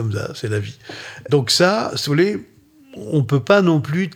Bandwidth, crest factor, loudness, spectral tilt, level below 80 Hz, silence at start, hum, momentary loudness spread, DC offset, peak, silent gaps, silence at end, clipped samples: 17 kHz; 18 dB; -18 LUFS; -5.5 dB/octave; -58 dBFS; 0 s; none; 18 LU; under 0.1%; -2 dBFS; none; 0 s; under 0.1%